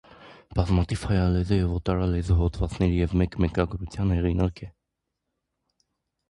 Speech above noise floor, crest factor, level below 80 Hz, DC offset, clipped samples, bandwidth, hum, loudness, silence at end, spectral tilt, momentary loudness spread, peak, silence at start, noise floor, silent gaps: 58 dB; 16 dB; -32 dBFS; under 0.1%; under 0.1%; 11.5 kHz; none; -25 LUFS; 1.6 s; -8 dB/octave; 5 LU; -8 dBFS; 0.2 s; -82 dBFS; none